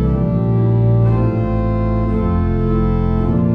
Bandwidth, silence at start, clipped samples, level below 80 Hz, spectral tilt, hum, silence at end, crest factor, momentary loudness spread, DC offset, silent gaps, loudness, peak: 4.4 kHz; 0 s; under 0.1%; -22 dBFS; -11.5 dB/octave; none; 0 s; 10 dB; 4 LU; under 0.1%; none; -16 LUFS; -4 dBFS